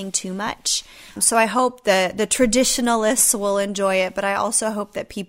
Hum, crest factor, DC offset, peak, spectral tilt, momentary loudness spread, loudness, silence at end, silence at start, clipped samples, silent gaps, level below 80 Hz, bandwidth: none; 18 dB; under 0.1%; -2 dBFS; -2 dB/octave; 8 LU; -19 LUFS; 0.05 s; 0 s; under 0.1%; none; -48 dBFS; 16 kHz